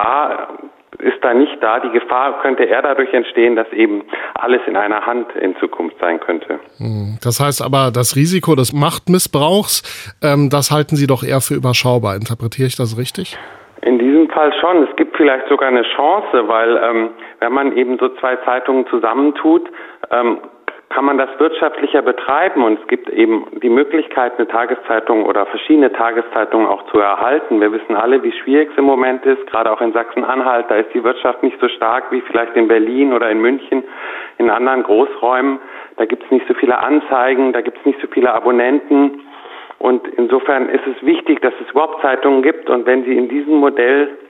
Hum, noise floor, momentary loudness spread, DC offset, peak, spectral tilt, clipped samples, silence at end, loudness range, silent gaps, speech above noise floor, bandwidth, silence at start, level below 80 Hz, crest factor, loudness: none; -34 dBFS; 7 LU; under 0.1%; -2 dBFS; -5.5 dB/octave; under 0.1%; 0.05 s; 2 LU; none; 20 dB; 17 kHz; 0 s; -58 dBFS; 14 dB; -14 LUFS